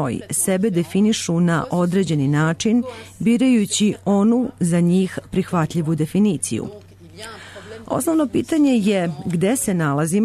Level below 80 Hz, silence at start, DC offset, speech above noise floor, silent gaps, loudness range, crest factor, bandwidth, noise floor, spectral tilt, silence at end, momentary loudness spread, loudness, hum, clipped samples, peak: -52 dBFS; 0 s; under 0.1%; 20 dB; none; 4 LU; 10 dB; 13.5 kHz; -38 dBFS; -5.5 dB/octave; 0 s; 10 LU; -19 LUFS; none; under 0.1%; -8 dBFS